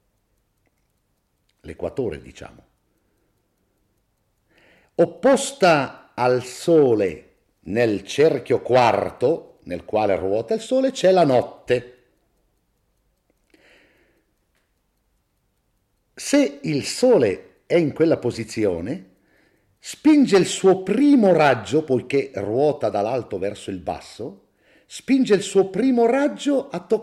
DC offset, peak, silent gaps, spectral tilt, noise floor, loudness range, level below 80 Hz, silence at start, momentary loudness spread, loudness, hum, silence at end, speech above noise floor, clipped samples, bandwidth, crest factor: under 0.1%; -4 dBFS; none; -5.5 dB/octave; -69 dBFS; 15 LU; -60 dBFS; 1.65 s; 16 LU; -20 LUFS; none; 0 s; 50 dB; under 0.1%; 13 kHz; 18 dB